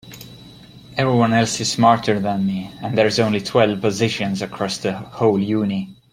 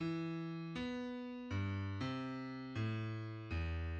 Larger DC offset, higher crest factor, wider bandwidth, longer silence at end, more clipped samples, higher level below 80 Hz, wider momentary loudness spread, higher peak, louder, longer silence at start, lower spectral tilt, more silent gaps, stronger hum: neither; about the same, 18 dB vs 14 dB; first, 16 kHz vs 8 kHz; first, 0.2 s vs 0 s; neither; about the same, -54 dBFS vs -54 dBFS; first, 11 LU vs 4 LU; first, -2 dBFS vs -28 dBFS; first, -19 LUFS vs -43 LUFS; about the same, 0.05 s vs 0 s; second, -5 dB/octave vs -7.5 dB/octave; neither; neither